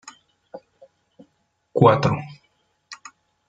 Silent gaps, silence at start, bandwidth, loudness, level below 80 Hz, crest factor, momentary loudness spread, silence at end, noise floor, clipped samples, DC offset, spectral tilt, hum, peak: none; 0.05 s; 7.8 kHz; -19 LUFS; -60 dBFS; 24 dB; 28 LU; 0.55 s; -69 dBFS; under 0.1%; under 0.1%; -7 dB/octave; none; 0 dBFS